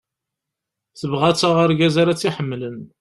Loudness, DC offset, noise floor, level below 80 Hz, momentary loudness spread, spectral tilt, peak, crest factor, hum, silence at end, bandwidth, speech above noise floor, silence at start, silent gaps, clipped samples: -18 LUFS; under 0.1%; -83 dBFS; -54 dBFS; 13 LU; -5.5 dB/octave; -2 dBFS; 18 dB; none; 0.15 s; 12 kHz; 65 dB; 0.95 s; none; under 0.1%